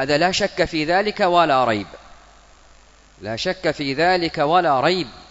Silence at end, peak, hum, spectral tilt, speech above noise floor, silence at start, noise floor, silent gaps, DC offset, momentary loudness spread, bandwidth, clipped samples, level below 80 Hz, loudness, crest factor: 0.1 s; -2 dBFS; none; -4.5 dB/octave; 30 dB; 0 s; -50 dBFS; none; under 0.1%; 9 LU; 8 kHz; under 0.1%; -48 dBFS; -19 LUFS; 18 dB